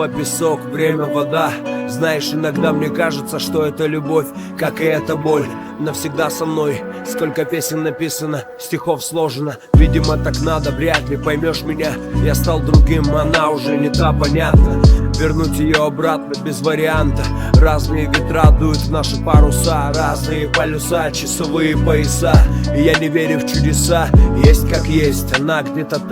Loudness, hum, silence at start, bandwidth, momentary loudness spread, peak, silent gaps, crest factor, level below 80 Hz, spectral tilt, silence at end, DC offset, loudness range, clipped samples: -16 LUFS; none; 0 s; 18.5 kHz; 9 LU; 0 dBFS; none; 14 dB; -20 dBFS; -5.5 dB/octave; 0 s; under 0.1%; 5 LU; under 0.1%